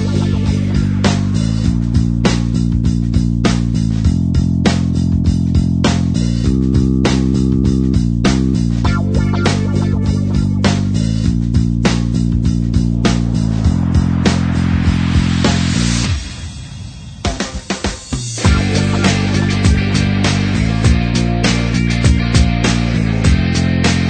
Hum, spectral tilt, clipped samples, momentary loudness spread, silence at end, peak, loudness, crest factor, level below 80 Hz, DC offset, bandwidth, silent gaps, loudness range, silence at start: none; -6 dB/octave; under 0.1%; 3 LU; 0 s; 0 dBFS; -15 LUFS; 14 dB; -22 dBFS; under 0.1%; 9.4 kHz; none; 3 LU; 0 s